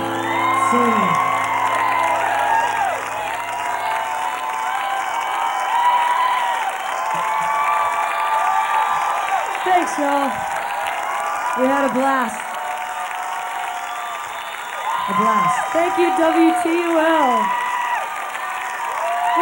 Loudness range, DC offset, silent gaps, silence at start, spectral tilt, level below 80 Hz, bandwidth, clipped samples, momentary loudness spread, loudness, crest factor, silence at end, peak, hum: 4 LU; under 0.1%; none; 0 s; -3.5 dB/octave; -62 dBFS; over 20 kHz; under 0.1%; 9 LU; -19 LUFS; 14 dB; 0 s; -4 dBFS; none